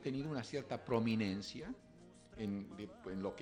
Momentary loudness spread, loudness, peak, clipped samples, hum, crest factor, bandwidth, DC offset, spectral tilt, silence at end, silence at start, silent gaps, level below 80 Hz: 17 LU; -42 LUFS; -22 dBFS; under 0.1%; none; 20 dB; 10.5 kHz; under 0.1%; -6.5 dB/octave; 0 s; 0 s; none; -68 dBFS